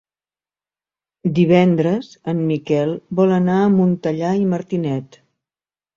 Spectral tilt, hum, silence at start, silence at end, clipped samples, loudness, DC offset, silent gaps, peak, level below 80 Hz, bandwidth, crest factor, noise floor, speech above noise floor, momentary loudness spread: -8.5 dB/octave; 50 Hz at -40 dBFS; 1.25 s; 0.9 s; under 0.1%; -18 LUFS; under 0.1%; none; -2 dBFS; -58 dBFS; 7.2 kHz; 16 dB; under -90 dBFS; over 73 dB; 10 LU